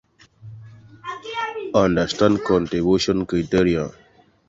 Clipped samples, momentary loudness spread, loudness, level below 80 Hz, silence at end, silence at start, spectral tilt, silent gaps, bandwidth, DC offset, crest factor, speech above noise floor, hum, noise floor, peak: under 0.1%; 16 LU; -20 LUFS; -44 dBFS; 0.6 s; 0.45 s; -6 dB/octave; none; 7.8 kHz; under 0.1%; 18 dB; 24 dB; none; -44 dBFS; -4 dBFS